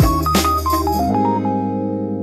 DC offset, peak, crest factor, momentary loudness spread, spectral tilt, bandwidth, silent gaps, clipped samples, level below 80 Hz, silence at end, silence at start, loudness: under 0.1%; -4 dBFS; 14 dB; 6 LU; -5.5 dB/octave; 16 kHz; none; under 0.1%; -28 dBFS; 0 s; 0 s; -18 LUFS